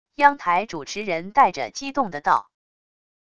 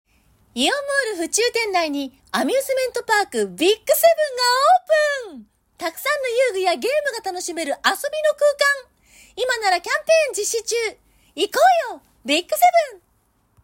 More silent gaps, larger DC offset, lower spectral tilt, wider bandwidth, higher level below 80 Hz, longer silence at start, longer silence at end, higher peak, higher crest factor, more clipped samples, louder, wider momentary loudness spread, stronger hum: neither; first, 0.4% vs under 0.1%; first, -3.5 dB/octave vs -1 dB/octave; second, 8.2 kHz vs 16.5 kHz; about the same, -60 dBFS vs -62 dBFS; second, 0.2 s vs 0.55 s; about the same, 0.8 s vs 0.7 s; first, 0 dBFS vs -4 dBFS; first, 22 dB vs 16 dB; neither; second, -22 LUFS vs -19 LUFS; about the same, 10 LU vs 11 LU; neither